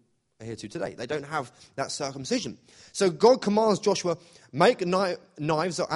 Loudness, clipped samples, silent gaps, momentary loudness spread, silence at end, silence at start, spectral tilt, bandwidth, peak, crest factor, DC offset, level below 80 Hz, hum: -26 LUFS; under 0.1%; none; 17 LU; 0 s; 0.4 s; -4.5 dB/octave; 11.5 kHz; -6 dBFS; 20 dB; under 0.1%; -66 dBFS; none